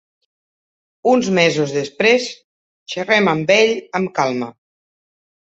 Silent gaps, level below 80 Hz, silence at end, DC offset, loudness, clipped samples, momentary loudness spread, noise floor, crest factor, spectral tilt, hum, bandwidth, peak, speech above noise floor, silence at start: 2.44-2.86 s; -62 dBFS; 1 s; under 0.1%; -16 LUFS; under 0.1%; 12 LU; under -90 dBFS; 18 dB; -4.5 dB/octave; none; 8.2 kHz; -2 dBFS; over 74 dB; 1.05 s